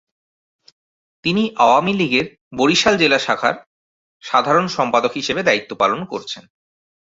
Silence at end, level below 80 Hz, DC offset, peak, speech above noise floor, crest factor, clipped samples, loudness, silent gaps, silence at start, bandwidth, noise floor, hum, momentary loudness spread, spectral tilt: 0.65 s; -56 dBFS; under 0.1%; 0 dBFS; over 73 dB; 18 dB; under 0.1%; -17 LUFS; 2.41-2.51 s, 3.66-4.20 s; 1.25 s; 8 kHz; under -90 dBFS; none; 14 LU; -4 dB/octave